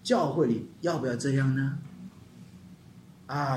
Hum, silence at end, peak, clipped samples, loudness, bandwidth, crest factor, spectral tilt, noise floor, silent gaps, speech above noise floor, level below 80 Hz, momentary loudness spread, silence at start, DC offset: none; 0 s; -12 dBFS; under 0.1%; -29 LUFS; 12 kHz; 18 dB; -6.5 dB/octave; -52 dBFS; none; 24 dB; -66 dBFS; 24 LU; 0.05 s; under 0.1%